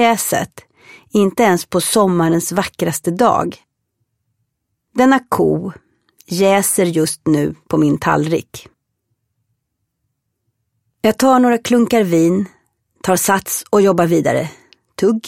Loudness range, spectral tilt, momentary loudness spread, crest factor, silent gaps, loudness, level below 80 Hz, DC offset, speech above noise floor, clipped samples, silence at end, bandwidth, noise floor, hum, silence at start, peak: 5 LU; -5 dB/octave; 10 LU; 16 dB; none; -15 LUFS; -52 dBFS; under 0.1%; 59 dB; under 0.1%; 0 s; 16.5 kHz; -73 dBFS; none; 0 s; 0 dBFS